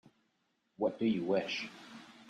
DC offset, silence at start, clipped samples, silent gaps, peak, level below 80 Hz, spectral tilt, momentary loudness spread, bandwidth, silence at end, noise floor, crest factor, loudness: under 0.1%; 0.8 s; under 0.1%; none; -18 dBFS; -80 dBFS; -5.5 dB/octave; 18 LU; 9.4 kHz; 0 s; -79 dBFS; 18 dB; -35 LUFS